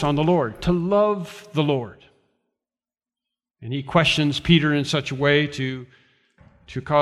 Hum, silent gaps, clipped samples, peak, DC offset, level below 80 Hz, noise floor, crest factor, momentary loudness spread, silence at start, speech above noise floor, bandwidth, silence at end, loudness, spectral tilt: none; none; under 0.1%; -2 dBFS; under 0.1%; -46 dBFS; under -90 dBFS; 20 dB; 15 LU; 0 s; over 69 dB; 12 kHz; 0 s; -21 LUFS; -6 dB/octave